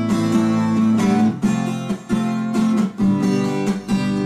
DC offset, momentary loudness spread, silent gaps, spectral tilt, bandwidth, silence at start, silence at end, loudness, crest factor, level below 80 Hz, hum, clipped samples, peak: under 0.1%; 6 LU; none; -7 dB/octave; 12.5 kHz; 0 s; 0 s; -19 LUFS; 12 dB; -50 dBFS; none; under 0.1%; -6 dBFS